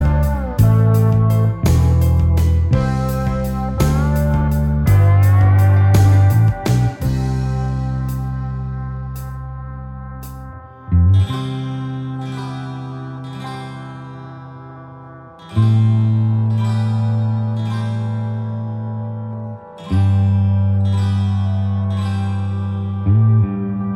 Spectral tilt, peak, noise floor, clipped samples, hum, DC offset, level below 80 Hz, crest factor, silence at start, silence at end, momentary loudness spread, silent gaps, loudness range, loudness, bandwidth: -8 dB/octave; 0 dBFS; -37 dBFS; under 0.1%; none; under 0.1%; -26 dBFS; 16 dB; 0 s; 0 s; 18 LU; none; 11 LU; -17 LUFS; 16 kHz